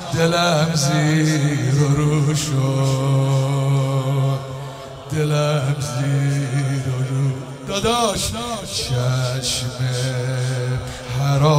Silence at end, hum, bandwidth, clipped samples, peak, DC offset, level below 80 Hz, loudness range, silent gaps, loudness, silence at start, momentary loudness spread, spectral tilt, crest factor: 0 s; none; 15.5 kHz; under 0.1%; -6 dBFS; under 0.1%; -44 dBFS; 4 LU; none; -20 LUFS; 0 s; 8 LU; -5.5 dB/octave; 14 dB